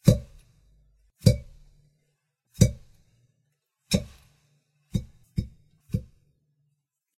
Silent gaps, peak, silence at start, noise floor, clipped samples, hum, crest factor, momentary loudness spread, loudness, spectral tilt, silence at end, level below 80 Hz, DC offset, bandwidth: none; -4 dBFS; 0.05 s; -77 dBFS; under 0.1%; none; 26 dB; 12 LU; -28 LUFS; -6 dB/octave; 1.15 s; -42 dBFS; under 0.1%; 15.5 kHz